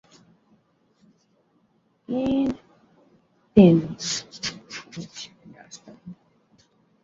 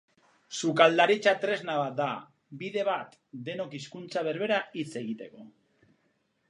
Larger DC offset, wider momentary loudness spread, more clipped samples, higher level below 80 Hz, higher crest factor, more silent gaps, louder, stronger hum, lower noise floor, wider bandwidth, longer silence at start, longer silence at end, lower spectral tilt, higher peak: neither; first, 28 LU vs 18 LU; neither; first, -56 dBFS vs -82 dBFS; about the same, 24 dB vs 26 dB; neither; first, -22 LUFS vs -28 LUFS; neither; second, -66 dBFS vs -73 dBFS; second, 7.8 kHz vs 11 kHz; first, 2.1 s vs 0.5 s; about the same, 0.9 s vs 1 s; first, -6 dB/octave vs -4.5 dB/octave; about the same, -2 dBFS vs -4 dBFS